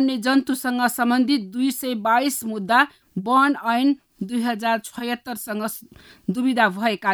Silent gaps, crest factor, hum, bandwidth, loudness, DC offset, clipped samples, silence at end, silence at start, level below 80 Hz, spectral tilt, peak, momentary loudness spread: none; 18 dB; none; over 20 kHz; -22 LUFS; under 0.1%; under 0.1%; 0 s; 0 s; -66 dBFS; -4 dB/octave; -4 dBFS; 10 LU